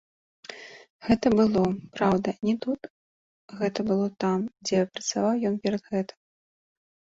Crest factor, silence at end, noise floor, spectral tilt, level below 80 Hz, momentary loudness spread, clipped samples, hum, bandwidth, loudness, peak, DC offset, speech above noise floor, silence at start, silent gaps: 20 dB; 1.15 s; under -90 dBFS; -5.5 dB/octave; -56 dBFS; 20 LU; under 0.1%; none; 7.8 kHz; -26 LUFS; -8 dBFS; under 0.1%; over 65 dB; 0.5 s; 0.90-0.99 s, 2.90-3.48 s